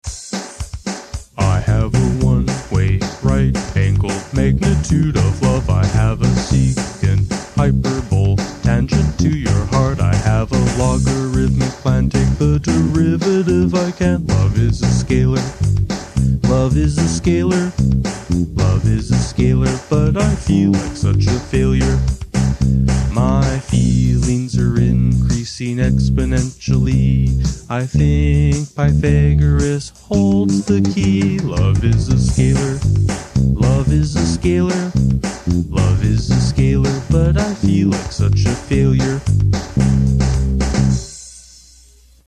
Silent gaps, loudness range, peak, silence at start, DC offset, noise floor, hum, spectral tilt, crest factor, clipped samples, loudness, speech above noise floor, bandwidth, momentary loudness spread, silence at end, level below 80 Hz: none; 1 LU; 0 dBFS; 0.05 s; 0.1%; -47 dBFS; none; -6.5 dB/octave; 14 dB; under 0.1%; -16 LUFS; 32 dB; 11 kHz; 4 LU; 0.85 s; -24 dBFS